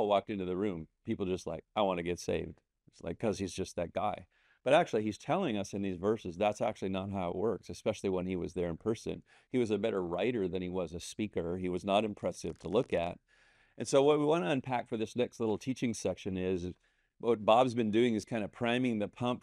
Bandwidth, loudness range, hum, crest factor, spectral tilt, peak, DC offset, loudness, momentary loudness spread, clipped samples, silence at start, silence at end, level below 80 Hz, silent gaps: 13 kHz; 4 LU; none; 22 dB; -5.5 dB/octave; -12 dBFS; under 0.1%; -34 LUFS; 10 LU; under 0.1%; 0 s; 0.05 s; -64 dBFS; none